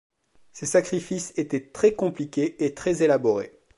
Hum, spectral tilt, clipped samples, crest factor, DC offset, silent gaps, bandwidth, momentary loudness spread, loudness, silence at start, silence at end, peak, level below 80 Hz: none; -5.5 dB/octave; under 0.1%; 18 dB; under 0.1%; none; 11.5 kHz; 8 LU; -25 LUFS; 0.55 s; 0.3 s; -8 dBFS; -60 dBFS